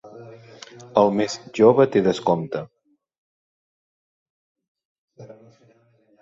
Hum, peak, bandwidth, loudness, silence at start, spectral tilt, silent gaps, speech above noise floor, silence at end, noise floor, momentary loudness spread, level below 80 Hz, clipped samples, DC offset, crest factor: none; -2 dBFS; 7.8 kHz; -20 LUFS; 0.05 s; -6 dB/octave; 3.18-4.55 s, 4.68-4.75 s, 4.85-5.08 s; 40 dB; 0.95 s; -59 dBFS; 27 LU; -64 dBFS; under 0.1%; under 0.1%; 22 dB